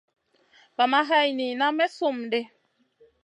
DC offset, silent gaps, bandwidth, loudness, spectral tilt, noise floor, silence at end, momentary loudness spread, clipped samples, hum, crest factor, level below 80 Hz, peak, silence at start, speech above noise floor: under 0.1%; none; 11 kHz; -24 LUFS; -3.5 dB/octave; -61 dBFS; 0.75 s; 9 LU; under 0.1%; none; 20 dB; -84 dBFS; -8 dBFS; 0.8 s; 38 dB